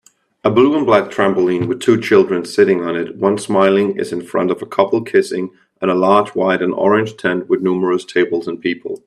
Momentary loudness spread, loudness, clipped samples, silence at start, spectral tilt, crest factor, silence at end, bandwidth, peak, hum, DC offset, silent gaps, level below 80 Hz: 8 LU; -16 LUFS; under 0.1%; 0.45 s; -6 dB/octave; 16 dB; 0.1 s; 12 kHz; 0 dBFS; none; under 0.1%; none; -60 dBFS